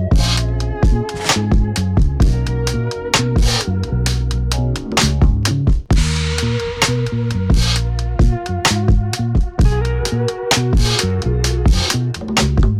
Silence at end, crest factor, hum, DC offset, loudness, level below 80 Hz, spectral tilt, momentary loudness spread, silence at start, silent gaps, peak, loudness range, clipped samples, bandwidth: 0 s; 12 dB; none; under 0.1%; -17 LUFS; -18 dBFS; -5 dB/octave; 4 LU; 0 s; none; -2 dBFS; 1 LU; under 0.1%; 15 kHz